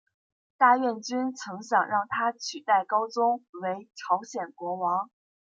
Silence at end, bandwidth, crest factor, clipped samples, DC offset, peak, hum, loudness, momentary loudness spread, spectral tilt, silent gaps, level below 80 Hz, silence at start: 0.55 s; 7.8 kHz; 20 dB; under 0.1%; under 0.1%; -8 dBFS; none; -27 LUFS; 12 LU; -3.5 dB/octave; 3.49-3.53 s; -84 dBFS; 0.6 s